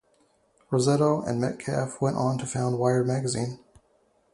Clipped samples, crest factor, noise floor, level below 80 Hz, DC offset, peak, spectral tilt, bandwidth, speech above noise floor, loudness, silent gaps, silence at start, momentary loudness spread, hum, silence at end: under 0.1%; 18 dB; -66 dBFS; -60 dBFS; under 0.1%; -8 dBFS; -6 dB/octave; 11.5 kHz; 41 dB; -26 LUFS; none; 0.7 s; 7 LU; none; 0.8 s